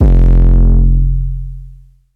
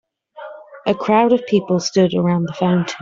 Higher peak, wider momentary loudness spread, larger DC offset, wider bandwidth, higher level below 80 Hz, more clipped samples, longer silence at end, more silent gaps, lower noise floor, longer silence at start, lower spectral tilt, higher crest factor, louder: about the same, 0 dBFS vs -2 dBFS; second, 17 LU vs 21 LU; neither; second, 1.8 kHz vs 7.6 kHz; first, -10 dBFS vs -58 dBFS; neither; first, 0.4 s vs 0 s; neither; about the same, -37 dBFS vs -37 dBFS; second, 0 s vs 0.35 s; first, -11 dB/octave vs -6 dB/octave; second, 8 dB vs 14 dB; first, -12 LUFS vs -17 LUFS